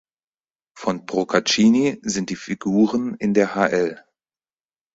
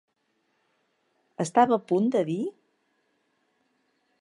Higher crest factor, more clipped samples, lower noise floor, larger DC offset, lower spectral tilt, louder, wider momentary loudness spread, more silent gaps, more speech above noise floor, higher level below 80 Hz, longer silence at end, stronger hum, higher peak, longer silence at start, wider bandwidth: about the same, 20 dB vs 22 dB; neither; first, under -90 dBFS vs -74 dBFS; neither; second, -4.5 dB/octave vs -6.5 dB/octave; first, -20 LUFS vs -25 LUFS; about the same, 11 LU vs 11 LU; neither; first, over 70 dB vs 50 dB; first, -60 dBFS vs -78 dBFS; second, 1 s vs 1.7 s; neither; first, -2 dBFS vs -6 dBFS; second, 0.75 s vs 1.4 s; second, 8 kHz vs 11.5 kHz